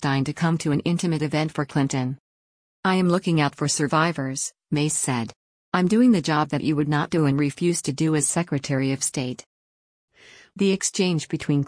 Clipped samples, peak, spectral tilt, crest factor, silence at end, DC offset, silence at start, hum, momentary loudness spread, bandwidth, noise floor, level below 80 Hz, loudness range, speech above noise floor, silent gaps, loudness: under 0.1%; -8 dBFS; -5 dB/octave; 16 dB; 0 s; under 0.1%; 0 s; none; 7 LU; 10.5 kHz; under -90 dBFS; -60 dBFS; 3 LU; over 68 dB; 2.20-2.83 s, 5.36-5.72 s, 9.46-10.08 s; -23 LUFS